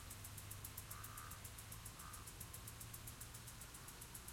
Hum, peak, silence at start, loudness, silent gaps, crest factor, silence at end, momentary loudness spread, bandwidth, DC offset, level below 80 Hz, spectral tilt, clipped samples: none; -32 dBFS; 0 s; -53 LUFS; none; 22 dB; 0 s; 2 LU; 16.5 kHz; under 0.1%; -62 dBFS; -2.5 dB/octave; under 0.1%